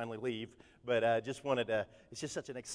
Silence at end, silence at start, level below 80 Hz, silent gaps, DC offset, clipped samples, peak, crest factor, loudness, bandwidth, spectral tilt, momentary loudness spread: 0 s; 0 s; -70 dBFS; none; under 0.1%; under 0.1%; -20 dBFS; 18 dB; -37 LUFS; 11 kHz; -4.5 dB/octave; 13 LU